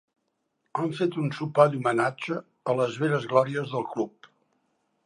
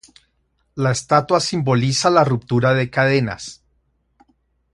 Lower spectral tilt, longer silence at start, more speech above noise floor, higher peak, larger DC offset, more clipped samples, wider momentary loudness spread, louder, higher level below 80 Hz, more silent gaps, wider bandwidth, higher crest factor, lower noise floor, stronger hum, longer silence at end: first, -7 dB/octave vs -5 dB/octave; about the same, 0.75 s vs 0.75 s; about the same, 51 dB vs 49 dB; second, -4 dBFS vs 0 dBFS; neither; neither; about the same, 11 LU vs 11 LU; second, -27 LUFS vs -18 LUFS; second, -76 dBFS vs -52 dBFS; neither; about the same, 11 kHz vs 11.5 kHz; about the same, 24 dB vs 20 dB; first, -77 dBFS vs -66 dBFS; neither; second, 1 s vs 1.2 s